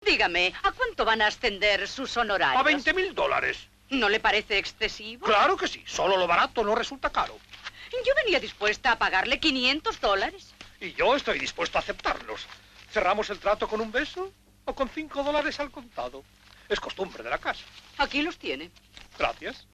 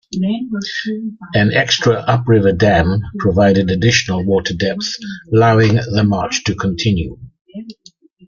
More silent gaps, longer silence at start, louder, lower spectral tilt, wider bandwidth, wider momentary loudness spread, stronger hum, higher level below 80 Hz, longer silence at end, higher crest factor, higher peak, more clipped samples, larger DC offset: second, none vs 7.41-7.45 s; about the same, 0 s vs 0.1 s; second, -26 LUFS vs -15 LUFS; second, -2.5 dB/octave vs -5.5 dB/octave; first, 13.5 kHz vs 7.4 kHz; first, 15 LU vs 11 LU; neither; second, -50 dBFS vs -40 dBFS; second, 0.15 s vs 0.55 s; about the same, 16 dB vs 14 dB; second, -10 dBFS vs -2 dBFS; neither; neither